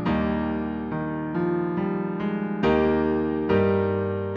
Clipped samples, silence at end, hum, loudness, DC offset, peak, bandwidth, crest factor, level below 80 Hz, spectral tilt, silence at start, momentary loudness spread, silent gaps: under 0.1%; 0 s; none; -25 LUFS; under 0.1%; -8 dBFS; 6.4 kHz; 16 dB; -44 dBFS; -9.5 dB/octave; 0 s; 7 LU; none